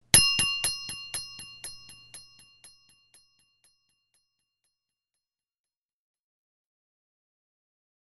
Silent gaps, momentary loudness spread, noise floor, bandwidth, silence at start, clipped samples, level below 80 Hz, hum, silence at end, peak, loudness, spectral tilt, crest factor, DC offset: none; 28 LU; under -90 dBFS; 13 kHz; 0.15 s; under 0.1%; -54 dBFS; none; 5.4 s; -2 dBFS; -24 LUFS; 0 dB/octave; 32 dB; under 0.1%